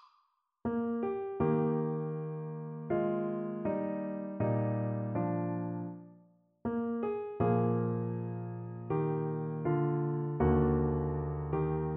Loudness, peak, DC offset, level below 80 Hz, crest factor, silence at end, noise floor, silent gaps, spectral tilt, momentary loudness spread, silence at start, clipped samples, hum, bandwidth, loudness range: -34 LUFS; -16 dBFS; under 0.1%; -50 dBFS; 16 dB; 0 s; -75 dBFS; none; -10.5 dB/octave; 10 LU; 0.65 s; under 0.1%; none; 3.4 kHz; 3 LU